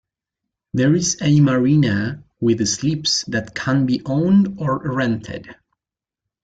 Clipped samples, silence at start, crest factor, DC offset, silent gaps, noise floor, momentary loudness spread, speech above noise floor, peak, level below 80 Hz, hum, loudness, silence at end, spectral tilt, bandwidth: under 0.1%; 0.75 s; 14 dB; under 0.1%; none; -88 dBFS; 10 LU; 71 dB; -6 dBFS; -52 dBFS; none; -18 LUFS; 0.9 s; -5 dB/octave; 9.2 kHz